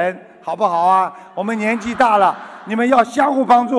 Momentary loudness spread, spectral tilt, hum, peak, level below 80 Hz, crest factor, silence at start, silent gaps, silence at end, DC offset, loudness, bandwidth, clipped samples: 12 LU; -5.5 dB/octave; none; -2 dBFS; -58 dBFS; 14 dB; 0 s; none; 0 s; under 0.1%; -16 LUFS; 11 kHz; under 0.1%